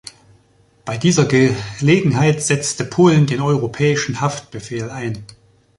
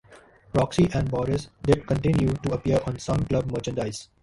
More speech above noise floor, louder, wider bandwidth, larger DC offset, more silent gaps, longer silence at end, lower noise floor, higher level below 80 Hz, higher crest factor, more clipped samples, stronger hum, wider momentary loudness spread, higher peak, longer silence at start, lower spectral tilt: first, 38 dB vs 28 dB; first, -17 LUFS vs -25 LUFS; about the same, 11.5 kHz vs 11.5 kHz; neither; neither; first, 0.55 s vs 0.2 s; about the same, -55 dBFS vs -52 dBFS; second, -50 dBFS vs -42 dBFS; about the same, 16 dB vs 18 dB; neither; neither; first, 14 LU vs 6 LU; first, -2 dBFS vs -6 dBFS; first, 0.85 s vs 0.1 s; second, -5.5 dB/octave vs -7 dB/octave